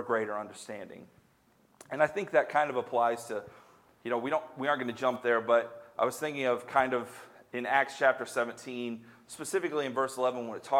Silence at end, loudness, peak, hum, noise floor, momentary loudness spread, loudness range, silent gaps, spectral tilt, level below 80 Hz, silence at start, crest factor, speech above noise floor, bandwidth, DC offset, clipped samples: 0 s; -31 LUFS; -10 dBFS; none; -66 dBFS; 15 LU; 2 LU; none; -4 dB/octave; -78 dBFS; 0 s; 22 dB; 35 dB; 16 kHz; under 0.1%; under 0.1%